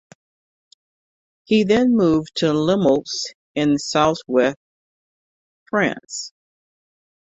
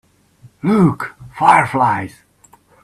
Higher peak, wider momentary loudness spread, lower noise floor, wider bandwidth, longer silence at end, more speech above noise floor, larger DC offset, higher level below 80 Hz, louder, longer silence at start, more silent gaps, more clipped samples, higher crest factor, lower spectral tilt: second, -4 dBFS vs 0 dBFS; second, 13 LU vs 16 LU; first, under -90 dBFS vs -51 dBFS; second, 8.2 kHz vs 13 kHz; first, 0.95 s vs 0.75 s; first, over 72 dB vs 37 dB; neither; about the same, -56 dBFS vs -52 dBFS; second, -19 LUFS vs -15 LUFS; first, 1.5 s vs 0.45 s; first, 3.35-3.55 s, 4.57-5.66 s vs none; neither; about the same, 18 dB vs 18 dB; second, -5 dB/octave vs -7 dB/octave